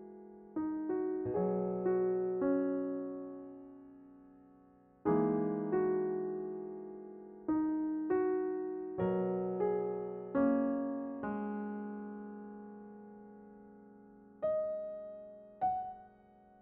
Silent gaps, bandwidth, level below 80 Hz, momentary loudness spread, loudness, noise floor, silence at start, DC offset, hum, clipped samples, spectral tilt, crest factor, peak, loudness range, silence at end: none; 3.3 kHz; -70 dBFS; 20 LU; -36 LUFS; -63 dBFS; 0 s; under 0.1%; none; under 0.1%; -9.5 dB/octave; 16 dB; -20 dBFS; 8 LU; 0.55 s